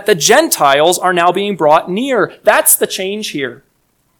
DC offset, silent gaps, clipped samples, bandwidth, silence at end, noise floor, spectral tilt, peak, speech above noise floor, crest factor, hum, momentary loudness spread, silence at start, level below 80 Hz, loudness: under 0.1%; none; 0.7%; over 20 kHz; 0.65 s; -60 dBFS; -2.5 dB/octave; 0 dBFS; 48 dB; 12 dB; none; 10 LU; 0 s; -58 dBFS; -12 LUFS